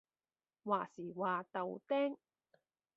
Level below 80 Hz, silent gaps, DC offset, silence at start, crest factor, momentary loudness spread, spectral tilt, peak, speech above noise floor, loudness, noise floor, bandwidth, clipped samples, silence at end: under -90 dBFS; none; under 0.1%; 0.65 s; 20 dB; 10 LU; -4.5 dB/octave; -20 dBFS; over 51 dB; -39 LUFS; under -90 dBFS; 7.2 kHz; under 0.1%; 0.8 s